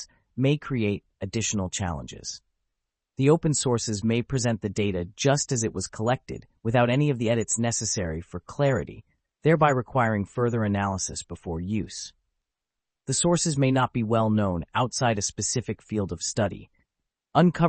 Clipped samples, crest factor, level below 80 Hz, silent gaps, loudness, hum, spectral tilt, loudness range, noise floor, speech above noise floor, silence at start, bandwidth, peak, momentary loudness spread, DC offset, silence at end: under 0.1%; 20 dB; -52 dBFS; none; -26 LUFS; none; -5 dB/octave; 3 LU; -87 dBFS; 62 dB; 0 s; 8.8 kHz; -6 dBFS; 13 LU; under 0.1%; 0 s